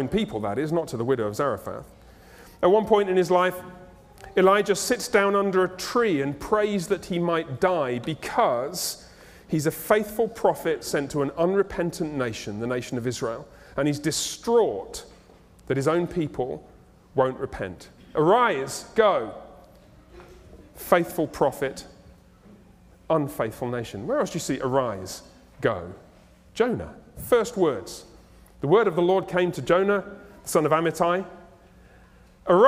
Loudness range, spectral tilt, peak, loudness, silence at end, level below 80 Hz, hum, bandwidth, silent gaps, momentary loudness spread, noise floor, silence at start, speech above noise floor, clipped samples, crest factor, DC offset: 6 LU; -5 dB/octave; -2 dBFS; -25 LUFS; 0 s; -54 dBFS; none; 16 kHz; none; 14 LU; -53 dBFS; 0 s; 29 dB; under 0.1%; 22 dB; under 0.1%